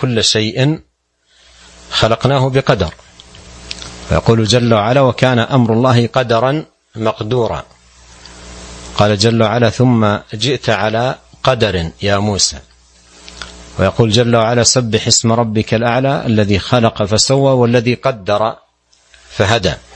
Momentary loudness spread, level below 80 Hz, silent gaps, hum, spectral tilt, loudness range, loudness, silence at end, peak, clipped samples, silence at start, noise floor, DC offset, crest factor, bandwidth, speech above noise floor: 14 LU; -38 dBFS; none; none; -4.5 dB/octave; 4 LU; -13 LUFS; 0.15 s; 0 dBFS; under 0.1%; 0 s; -58 dBFS; under 0.1%; 14 dB; 9.8 kHz; 45 dB